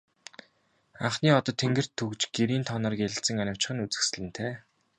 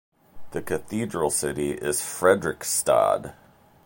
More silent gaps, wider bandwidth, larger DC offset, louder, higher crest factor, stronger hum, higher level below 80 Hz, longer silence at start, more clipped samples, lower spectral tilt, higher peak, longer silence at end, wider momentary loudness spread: neither; second, 11 kHz vs 17 kHz; neither; second, -28 LUFS vs -24 LUFS; about the same, 22 dB vs 20 dB; neither; second, -62 dBFS vs -54 dBFS; first, 1 s vs 0.35 s; neither; about the same, -4 dB/octave vs -3.5 dB/octave; second, -8 dBFS vs -4 dBFS; second, 0.4 s vs 0.55 s; first, 12 LU vs 9 LU